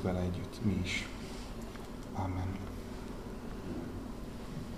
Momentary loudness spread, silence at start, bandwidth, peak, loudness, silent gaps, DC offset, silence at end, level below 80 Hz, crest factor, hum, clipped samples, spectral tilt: 10 LU; 0 s; 15.5 kHz; -20 dBFS; -40 LUFS; none; 0.1%; 0 s; -48 dBFS; 18 dB; none; under 0.1%; -6 dB/octave